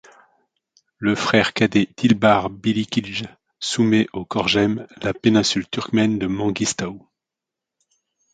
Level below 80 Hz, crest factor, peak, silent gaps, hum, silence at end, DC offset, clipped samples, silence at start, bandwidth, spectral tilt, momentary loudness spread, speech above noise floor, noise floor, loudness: -52 dBFS; 20 dB; 0 dBFS; none; none; 1.35 s; under 0.1%; under 0.1%; 1 s; 9.4 kHz; -4.5 dB/octave; 10 LU; 66 dB; -86 dBFS; -20 LUFS